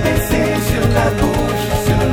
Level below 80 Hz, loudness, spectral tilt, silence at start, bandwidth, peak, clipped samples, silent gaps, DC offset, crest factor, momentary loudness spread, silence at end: -24 dBFS; -16 LUFS; -5.5 dB/octave; 0 s; 17.5 kHz; -2 dBFS; under 0.1%; none; under 0.1%; 12 dB; 2 LU; 0 s